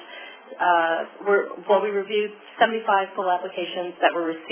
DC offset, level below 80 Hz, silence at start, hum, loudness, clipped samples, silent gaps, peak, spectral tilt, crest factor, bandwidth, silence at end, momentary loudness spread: under 0.1%; -86 dBFS; 0 s; none; -23 LUFS; under 0.1%; none; -2 dBFS; -7.5 dB/octave; 20 dB; 3.5 kHz; 0 s; 9 LU